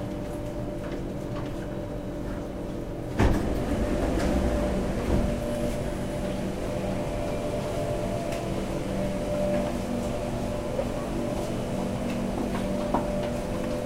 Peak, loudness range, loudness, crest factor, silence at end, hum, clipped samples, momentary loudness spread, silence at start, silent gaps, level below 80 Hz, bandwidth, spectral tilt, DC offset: -10 dBFS; 3 LU; -30 LUFS; 18 dB; 0 s; none; under 0.1%; 7 LU; 0 s; none; -36 dBFS; 16 kHz; -6.5 dB/octave; 0.2%